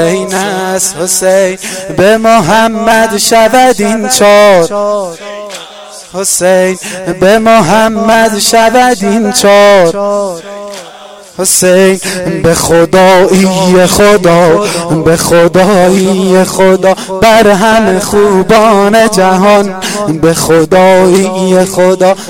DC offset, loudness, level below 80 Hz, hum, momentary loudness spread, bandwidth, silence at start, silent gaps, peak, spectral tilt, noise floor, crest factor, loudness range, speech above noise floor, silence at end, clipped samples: 1%; -6 LUFS; -36 dBFS; none; 10 LU; 18 kHz; 0 s; none; 0 dBFS; -4 dB/octave; -30 dBFS; 6 dB; 3 LU; 24 dB; 0 s; 1%